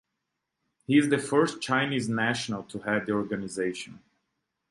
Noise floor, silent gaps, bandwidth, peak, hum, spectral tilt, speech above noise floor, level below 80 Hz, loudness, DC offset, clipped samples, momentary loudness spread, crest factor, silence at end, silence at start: -83 dBFS; none; 11.5 kHz; -10 dBFS; none; -5 dB/octave; 56 dB; -66 dBFS; -27 LUFS; under 0.1%; under 0.1%; 10 LU; 18 dB; 0.75 s; 0.9 s